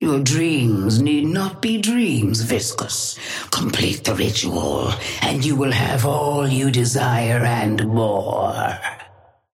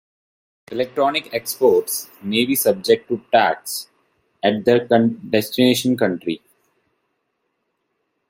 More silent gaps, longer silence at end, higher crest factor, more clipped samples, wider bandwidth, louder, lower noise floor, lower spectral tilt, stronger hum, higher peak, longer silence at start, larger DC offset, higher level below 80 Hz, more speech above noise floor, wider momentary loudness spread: neither; second, 0.5 s vs 1.9 s; about the same, 16 dB vs 18 dB; neither; about the same, 16.5 kHz vs 16.5 kHz; about the same, -19 LUFS vs -19 LUFS; second, -50 dBFS vs -73 dBFS; about the same, -4.5 dB/octave vs -4 dB/octave; neither; about the same, -4 dBFS vs -2 dBFS; second, 0 s vs 0.7 s; neither; first, -48 dBFS vs -62 dBFS; second, 31 dB vs 54 dB; second, 5 LU vs 10 LU